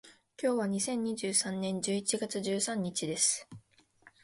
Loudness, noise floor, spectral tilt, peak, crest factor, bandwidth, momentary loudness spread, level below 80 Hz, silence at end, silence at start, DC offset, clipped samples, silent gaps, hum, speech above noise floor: -32 LUFS; -63 dBFS; -3 dB/octave; -16 dBFS; 18 dB; 11.5 kHz; 6 LU; -74 dBFS; 0.15 s; 0.05 s; under 0.1%; under 0.1%; none; none; 30 dB